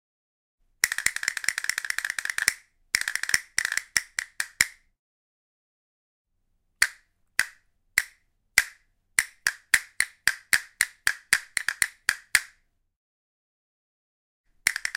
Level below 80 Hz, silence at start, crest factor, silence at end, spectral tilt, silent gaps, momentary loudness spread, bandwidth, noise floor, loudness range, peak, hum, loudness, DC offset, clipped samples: -62 dBFS; 0.85 s; 30 dB; 0.05 s; 2 dB/octave; 4.99-6.25 s, 12.96-14.44 s; 5 LU; 17 kHz; -72 dBFS; 6 LU; 0 dBFS; none; -26 LUFS; under 0.1%; under 0.1%